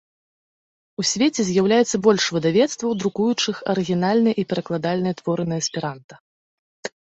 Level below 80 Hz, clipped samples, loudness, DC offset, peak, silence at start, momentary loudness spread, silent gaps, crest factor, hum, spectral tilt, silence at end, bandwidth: -62 dBFS; under 0.1%; -21 LUFS; under 0.1%; -4 dBFS; 1 s; 9 LU; 6.04-6.09 s, 6.20-6.83 s; 18 dB; none; -4.5 dB/octave; 0.15 s; 8.2 kHz